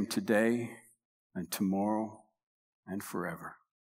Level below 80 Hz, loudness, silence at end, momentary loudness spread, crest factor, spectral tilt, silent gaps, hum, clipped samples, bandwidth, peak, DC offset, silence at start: -78 dBFS; -34 LUFS; 0.35 s; 17 LU; 20 dB; -5.5 dB/octave; 1.05-1.30 s, 2.43-2.83 s; none; under 0.1%; 16 kHz; -16 dBFS; under 0.1%; 0 s